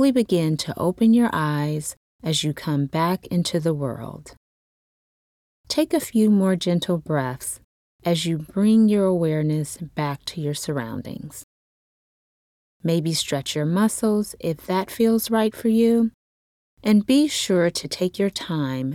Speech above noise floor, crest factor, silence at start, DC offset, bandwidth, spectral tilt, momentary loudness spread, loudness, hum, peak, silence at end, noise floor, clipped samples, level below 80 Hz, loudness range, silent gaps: over 69 dB; 14 dB; 0 s; under 0.1%; 16.5 kHz; -5.5 dB/octave; 12 LU; -22 LUFS; none; -8 dBFS; 0 s; under -90 dBFS; under 0.1%; -58 dBFS; 6 LU; 1.97-2.19 s, 4.37-5.64 s, 7.64-7.99 s, 11.43-12.80 s, 16.14-16.77 s